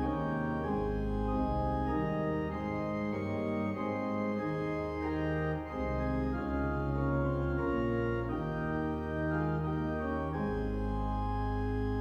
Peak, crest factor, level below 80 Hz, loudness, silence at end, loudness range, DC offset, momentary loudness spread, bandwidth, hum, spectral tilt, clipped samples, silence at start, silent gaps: -20 dBFS; 14 dB; -42 dBFS; -34 LUFS; 0 s; 1 LU; under 0.1%; 3 LU; 12 kHz; none; -9.5 dB/octave; under 0.1%; 0 s; none